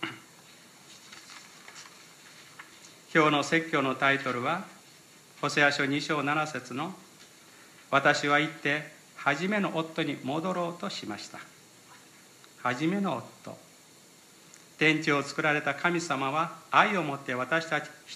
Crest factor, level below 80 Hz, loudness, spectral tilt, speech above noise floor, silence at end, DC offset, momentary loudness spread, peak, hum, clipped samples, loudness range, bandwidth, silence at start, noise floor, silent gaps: 24 dB; -80 dBFS; -28 LUFS; -4.5 dB/octave; 27 dB; 0 s; under 0.1%; 23 LU; -8 dBFS; none; under 0.1%; 8 LU; 15 kHz; 0 s; -55 dBFS; none